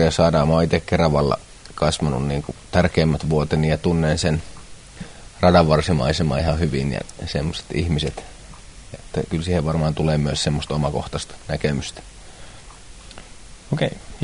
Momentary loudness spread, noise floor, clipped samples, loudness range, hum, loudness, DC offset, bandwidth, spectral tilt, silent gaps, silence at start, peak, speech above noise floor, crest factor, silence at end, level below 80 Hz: 22 LU; -41 dBFS; under 0.1%; 6 LU; none; -21 LUFS; under 0.1%; 11 kHz; -6 dB/octave; none; 0 s; -2 dBFS; 21 dB; 20 dB; 0 s; -34 dBFS